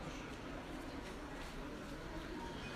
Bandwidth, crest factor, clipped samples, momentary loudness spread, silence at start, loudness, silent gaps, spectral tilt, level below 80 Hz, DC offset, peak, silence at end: 15.5 kHz; 12 dB; under 0.1%; 2 LU; 0 s; -48 LUFS; none; -5 dB/octave; -54 dBFS; under 0.1%; -34 dBFS; 0 s